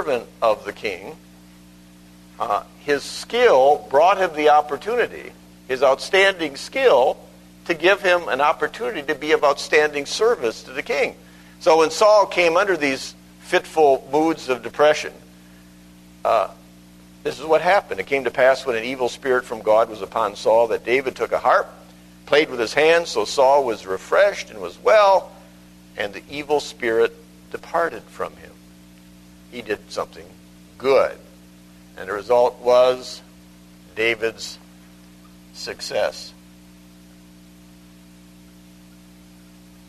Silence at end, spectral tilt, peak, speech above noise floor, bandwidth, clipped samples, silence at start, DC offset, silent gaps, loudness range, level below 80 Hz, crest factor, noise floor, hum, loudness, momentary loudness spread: 3.6 s; -3.5 dB/octave; 0 dBFS; 27 dB; 13.5 kHz; under 0.1%; 0 s; under 0.1%; none; 9 LU; -56 dBFS; 20 dB; -47 dBFS; 60 Hz at -50 dBFS; -19 LUFS; 16 LU